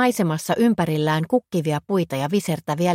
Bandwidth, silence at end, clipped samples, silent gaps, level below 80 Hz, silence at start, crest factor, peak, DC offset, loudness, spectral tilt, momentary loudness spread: 16.5 kHz; 0 s; under 0.1%; none; -60 dBFS; 0 s; 14 dB; -6 dBFS; under 0.1%; -22 LUFS; -6 dB/octave; 4 LU